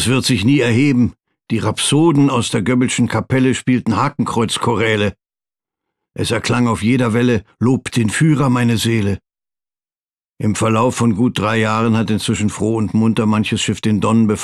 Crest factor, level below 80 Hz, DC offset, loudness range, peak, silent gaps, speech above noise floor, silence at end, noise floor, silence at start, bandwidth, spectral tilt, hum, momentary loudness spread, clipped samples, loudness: 12 dB; -46 dBFS; under 0.1%; 3 LU; -4 dBFS; 9.98-10.04 s, 10.25-10.33 s; over 75 dB; 0 s; under -90 dBFS; 0 s; 13.5 kHz; -5.5 dB/octave; none; 5 LU; under 0.1%; -16 LUFS